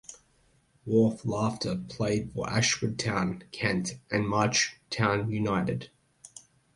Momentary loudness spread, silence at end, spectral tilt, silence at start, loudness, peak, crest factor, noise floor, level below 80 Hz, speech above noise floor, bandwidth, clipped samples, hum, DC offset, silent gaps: 15 LU; 0.35 s; -4.5 dB/octave; 0.1 s; -28 LUFS; -8 dBFS; 22 dB; -66 dBFS; -56 dBFS; 38 dB; 11.5 kHz; under 0.1%; none; under 0.1%; none